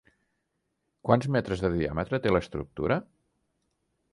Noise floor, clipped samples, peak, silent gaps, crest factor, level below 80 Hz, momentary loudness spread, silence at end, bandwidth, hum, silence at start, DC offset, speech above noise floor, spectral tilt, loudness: -79 dBFS; under 0.1%; -6 dBFS; none; 24 dB; -48 dBFS; 7 LU; 1.1 s; 11.5 kHz; none; 1.05 s; under 0.1%; 52 dB; -7.5 dB/octave; -28 LUFS